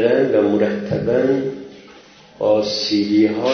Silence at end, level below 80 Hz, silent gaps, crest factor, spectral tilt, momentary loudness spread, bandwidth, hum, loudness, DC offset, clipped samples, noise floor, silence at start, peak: 0 s; -52 dBFS; none; 16 dB; -6 dB/octave; 9 LU; 6.6 kHz; none; -18 LUFS; under 0.1%; under 0.1%; -44 dBFS; 0 s; -2 dBFS